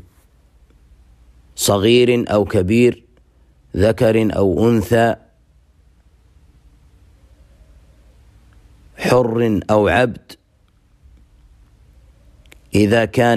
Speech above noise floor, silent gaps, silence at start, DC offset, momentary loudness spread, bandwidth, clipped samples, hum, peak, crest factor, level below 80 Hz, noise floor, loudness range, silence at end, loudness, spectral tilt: 41 dB; none; 1.55 s; under 0.1%; 9 LU; 15.5 kHz; under 0.1%; none; -2 dBFS; 16 dB; -44 dBFS; -56 dBFS; 7 LU; 0 s; -16 LUFS; -5.5 dB/octave